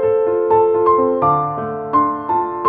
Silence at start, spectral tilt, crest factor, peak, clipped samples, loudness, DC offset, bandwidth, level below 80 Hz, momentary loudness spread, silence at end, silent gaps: 0 s; -11.5 dB/octave; 12 dB; -4 dBFS; under 0.1%; -16 LUFS; under 0.1%; 3.8 kHz; -50 dBFS; 6 LU; 0 s; none